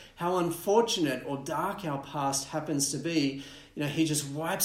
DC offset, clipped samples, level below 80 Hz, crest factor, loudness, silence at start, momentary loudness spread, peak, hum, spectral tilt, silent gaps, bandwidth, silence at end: under 0.1%; under 0.1%; -62 dBFS; 20 dB; -30 LUFS; 0 s; 8 LU; -10 dBFS; none; -4 dB/octave; none; 16 kHz; 0 s